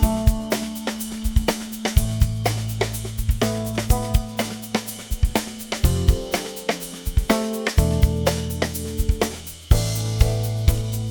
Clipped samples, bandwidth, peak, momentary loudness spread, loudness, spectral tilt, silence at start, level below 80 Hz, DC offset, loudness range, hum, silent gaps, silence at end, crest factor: under 0.1%; 19.5 kHz; -2 dBFS; 7 LU; -23 LUFS; -5 dB/octave; 0 s; -26 dBFS; under 0.1%; 2 LU; none; none; 0 s; 20 dB